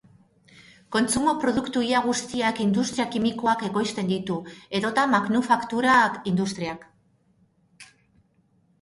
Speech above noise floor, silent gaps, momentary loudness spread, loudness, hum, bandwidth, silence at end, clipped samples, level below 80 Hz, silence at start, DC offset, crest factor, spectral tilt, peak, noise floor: 41 dB; none; 9 LU; -24 LUFS; none; 11.5 kHz; 0.95 s; under 0.1%; -60 dBFS; 0.6 s; under 0.1%; 20 dB; -4.5 dB/octave; -6 dBFS; -64 dBFS